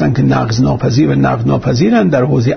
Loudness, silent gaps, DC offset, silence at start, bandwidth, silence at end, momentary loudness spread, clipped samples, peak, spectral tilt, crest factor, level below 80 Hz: -12 LUFS; none; under 0.1%; 0 s; 6.6 kHz; 0 s; 3 LU; under 0.1%; -2 dBFS; -7.5 dB/octave; 10 dB; -36 dBFS